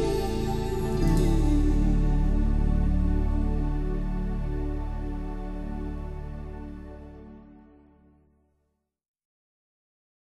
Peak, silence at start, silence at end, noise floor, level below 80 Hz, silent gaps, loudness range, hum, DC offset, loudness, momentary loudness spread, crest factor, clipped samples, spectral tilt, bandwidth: -12 dBFS; 0 s; 2.7 s; -77 dBFS; -28 dBFS; none; 18 LU; none; under 0.1%; -29 LUFS; 16 LU; 14 dB; under 0.1%; -7.5 dB/octave; 12.5 kHz